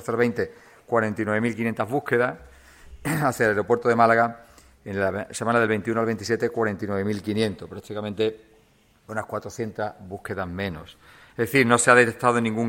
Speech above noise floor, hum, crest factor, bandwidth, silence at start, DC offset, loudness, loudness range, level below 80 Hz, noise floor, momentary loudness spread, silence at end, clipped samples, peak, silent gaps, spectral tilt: 36 dB; none; 24 dB; 16.5 kHz; 0 s; under 0.1%; -24 LUFS; 8 LU; -56 dBFS; -59 dBFS; 15 LU; 0 s; under 0.1%; 0 dBFS; none; -5 dB/octave